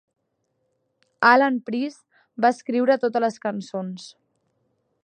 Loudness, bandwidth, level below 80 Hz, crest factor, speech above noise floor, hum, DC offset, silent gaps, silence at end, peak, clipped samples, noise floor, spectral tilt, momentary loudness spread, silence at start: -22 LUFS; 9.6 kHz; -78 dBFS; 24 dB; 52 dB; none; under 0.1%; none; 0.95 s; -2 dBFS; under 0.1%; -74 dBFS; -5.5 dB/octave; 16 LU; 1.2 s